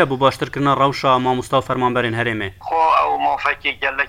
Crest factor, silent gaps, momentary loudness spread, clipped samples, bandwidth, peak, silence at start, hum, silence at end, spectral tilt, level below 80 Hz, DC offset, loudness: 18 dB; none; 5 LU; under 0.1%; 16.5 kHz; 0 dBFS; 0 s; none; 0 s; -5.5 dB/octave; -48 dBFS; under 0.1%; -18 LUFS